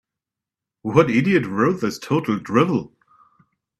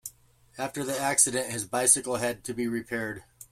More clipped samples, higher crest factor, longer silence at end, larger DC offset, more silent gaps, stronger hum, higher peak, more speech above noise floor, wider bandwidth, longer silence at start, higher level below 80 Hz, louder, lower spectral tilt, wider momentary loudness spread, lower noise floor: neither; about the same, 22 dB vs 22 dB; first, 0.9 s vs 0.1 s; neither; neither; neither; first, 0 dBFS vs -6 dBFS; first, 68 dB vs 27 dB; second, 13.5 kHz vs 16.5 kHz; first, 0.85 s vs 0.05 s; first, -58 dBFS vs -64 dBFS; first, -20 LUFS vs -26 LUFS; first, -7 dB/octave vs -2.5 dB/octave; second, 8 LU vs 15 LU; first, -87 dBFS vs -55 dBFS